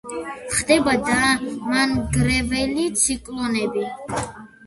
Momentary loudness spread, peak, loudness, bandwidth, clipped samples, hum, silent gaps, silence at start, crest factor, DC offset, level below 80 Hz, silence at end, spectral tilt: 11 LU; -2 dBFS; -21 LUFS; 12 kHz; under 0.1%; none; none; 0.05 s; 18 dB; under 0.1%; -40 dBFS; 0 s; -3.5 dB/octave